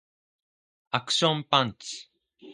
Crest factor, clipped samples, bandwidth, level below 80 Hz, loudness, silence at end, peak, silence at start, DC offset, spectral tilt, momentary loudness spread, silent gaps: 26 dB; under 0.1%; 11.5 kHz; -68 dBFS; -25 LUFS; 0 s; -4 dBFS; 0.95 s; under 0.1%; -3.5 dB/octave; 15 LU; none